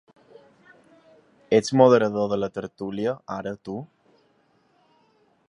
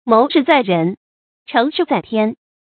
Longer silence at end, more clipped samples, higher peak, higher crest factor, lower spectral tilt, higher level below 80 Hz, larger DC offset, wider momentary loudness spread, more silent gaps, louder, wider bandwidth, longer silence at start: first, 1.65 s vs 0.3 s; neither; about the same, -2 dBFS vs 0 dBFS; first, 24 dB vs 16 dB; second, -6 dB/octave vs -8.5 dB/octave; about the same, -64 dBFS vs -62 dBFS; neither; first, 17 LU vs 8 LU; second, none vs 0.97-1.46 s; second, -23 LUFS vs -16 LUFS; first, 11 kHz vs 4.6 kHz; first, 1.5 s vs 0.05 s